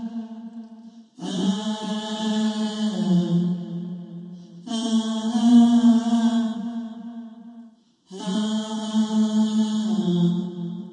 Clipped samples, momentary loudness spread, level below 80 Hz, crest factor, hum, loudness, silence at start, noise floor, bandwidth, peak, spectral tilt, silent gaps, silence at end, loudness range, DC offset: under 0.1%; 21 LU; -70 dBFS; 16 dB; none; -22 LUFS; 0 s; -51 dBFS; 9.6 kHz; -6 dBFS; -6.5 dB/octave; none; 0 s; 5 LU; under 0.1%